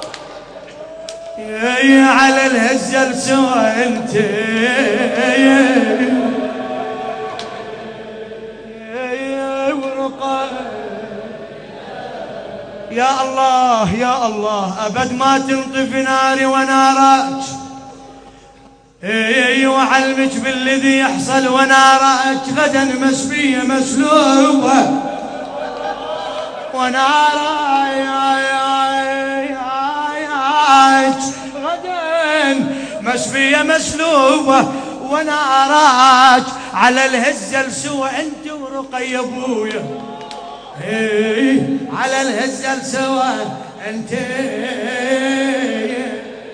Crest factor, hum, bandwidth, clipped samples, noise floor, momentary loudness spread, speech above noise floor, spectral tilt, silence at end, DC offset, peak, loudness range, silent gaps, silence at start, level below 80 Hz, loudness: 16 dB; none; 10.5 kHz; under 0.1%; -44 dBFS; 18 LU; 31 dB; -3 dB/octave; 0 s; under 0.1%; 0 dBFS; 10 LU; none; 0 s; -54 dBFS; -14 LUFS